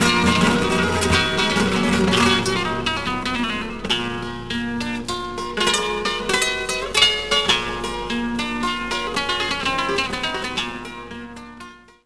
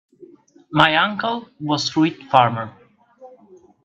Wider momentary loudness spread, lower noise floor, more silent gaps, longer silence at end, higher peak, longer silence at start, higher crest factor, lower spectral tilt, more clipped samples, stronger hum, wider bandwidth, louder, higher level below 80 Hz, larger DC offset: about the same, 11 LU vs 12 LU; second, -42 dBFS vs -50 dBFS; neither; second, 0 s vs 0.55 s; about the same, 0 dBFS vs 0 dBFS; second, 0 s vs 0.2 s; about the same, 20 dB vs 22 dB; second, -3.5 dB/octave vs -5 dB/octave; neither; neither; first, 11 kHz vs 8.4 kHz; about the same, -20 LUFS vs -19 LUFS; first, -40 dBFS vs -60 dBFS; first, 0.7% vs under 0.1%